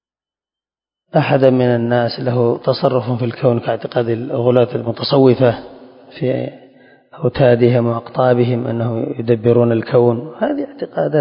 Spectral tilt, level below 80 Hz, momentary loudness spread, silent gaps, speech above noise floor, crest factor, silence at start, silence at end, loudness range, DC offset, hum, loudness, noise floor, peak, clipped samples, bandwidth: -10.5 dB/octave; -52 dBFS; 9 LU; none; over 75 dB; 16 dB; 1.15 s; 0 s; 2 LU; under 0.1%; none; -16 LUFS; under -90 dBFS; 0 dBFS; under 0.1%; 5.4 kHz